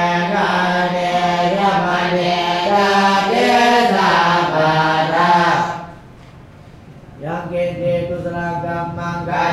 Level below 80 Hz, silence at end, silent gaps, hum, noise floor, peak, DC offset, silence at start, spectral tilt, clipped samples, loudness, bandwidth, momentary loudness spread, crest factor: -48 dBFS; 0 s; none; none; -40 dBFS; -2 dBFS; under 0.1%; 0 s; -5 dB/octave; under 0.1%; -16 LUFS; 14 kHz; 10 LU; 14 dB